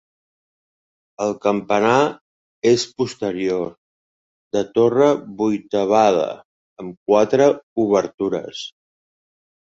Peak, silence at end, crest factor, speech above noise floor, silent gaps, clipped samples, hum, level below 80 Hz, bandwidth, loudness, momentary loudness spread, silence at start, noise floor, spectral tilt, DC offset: -2 dBFS; 1.05 s; 18 dB; over 72 dB; 2.21-2.62 s, 3.78-4.51 s, 6.45-6.76 s, 6.97-7.06 s, 7.63-7.76 s, 8.14-8.18 s; under 0.1%; none; -60 dBFS; 8 kHz; -19 LUFS; 16 LU; 1.2 s; under -90 dBFS; -5.5 dB/octave; under 0.1%